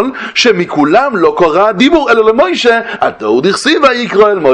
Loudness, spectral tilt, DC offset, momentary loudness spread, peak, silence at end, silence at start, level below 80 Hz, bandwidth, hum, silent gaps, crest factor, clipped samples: -9 LUFS; -4.5 dB/octave; under 0.1%; 4 LU; 0 dBFS; 0 s; 0 s; -44 dBFS; 11.5 kHz; none; none; 10 dB; 0.6%